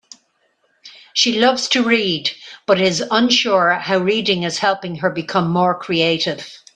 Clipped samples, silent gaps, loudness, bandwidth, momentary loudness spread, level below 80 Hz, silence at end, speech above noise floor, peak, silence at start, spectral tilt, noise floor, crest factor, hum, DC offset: under 0.1%; none; -17 LUFS; 10 kHz; 8 LU; -62 dBFS; 0.2 s; 47 dB; 0 dBFS; 0.85 s; -3.5 dB/octave; -64 dBFS; 18 dB; none; under 0.1%